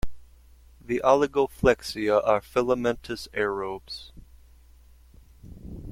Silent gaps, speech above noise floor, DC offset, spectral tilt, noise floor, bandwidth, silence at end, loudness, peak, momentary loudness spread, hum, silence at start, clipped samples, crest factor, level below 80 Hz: none; 28 dB; under 0.1%; -5.5 dB/octave; -53 dBFS; 16 kHz; 0 s; -25 LUFS; -6 dBFS; 18 LU; none; 0.05 s; under 0.1%; 22 dB; -46 dBFS